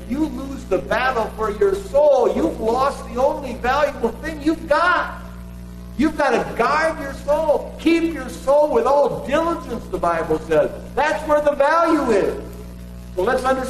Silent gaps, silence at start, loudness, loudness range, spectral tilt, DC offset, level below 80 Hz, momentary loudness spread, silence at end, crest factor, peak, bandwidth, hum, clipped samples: none; 0 s; -19 LUFS; 2 LU; -5.5 dB/octave; under 0.1%; -38 dBFS; 12 LU; 0 s; 14 dB; -6 dBFS; 13.5 kHz; 60 Hz at -35 dBFS; under 0.1%